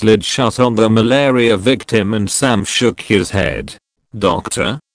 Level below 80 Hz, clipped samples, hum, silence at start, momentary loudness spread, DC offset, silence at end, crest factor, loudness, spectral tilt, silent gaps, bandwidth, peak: -40 dBFS; under 0.1%; none; 0 s; 7 LU; under 0.1%; 0.15 s; 14 dB; -14 LUFS; -4.5 dB/octave; none; 10.5 kHz; 0 dBFS